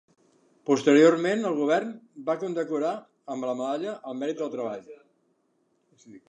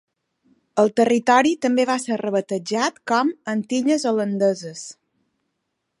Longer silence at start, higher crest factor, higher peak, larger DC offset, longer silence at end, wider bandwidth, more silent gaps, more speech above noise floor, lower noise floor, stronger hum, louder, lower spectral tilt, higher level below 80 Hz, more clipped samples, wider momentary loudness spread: about the same, 0.65 s vs 0.75 s; about the same, 20 dB vs 18 dB; second, -6 dBFS vs -2 dBFS; neither; second, 0.1 s vs 1.1 s; second, 8.8 kHz vs 11.5 kHz; neither; second, 45 dB vs 56 dB; second, -71 dBFS vs -77 dBFS; neither; second, -26 LUFS vs -20 LUFS; about the same, -5.5 dB/octave vs -4.5 dB/octave; second, -84 dBFS vs -74 dBFS; neither; first, 18 LU vs 10 LU